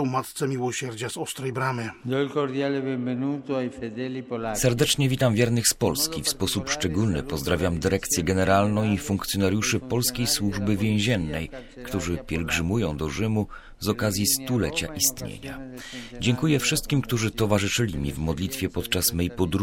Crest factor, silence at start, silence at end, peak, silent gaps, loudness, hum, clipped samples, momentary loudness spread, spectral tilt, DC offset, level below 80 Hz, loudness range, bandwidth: 20 dB; 0 s; 0 s; -6 dBFS; none; -25 LUFS; none; under 0.1%; 10 LU; -4.5 dB/octave; under 0.1%; -44 dBFS; 4 LU; 16.5 kHz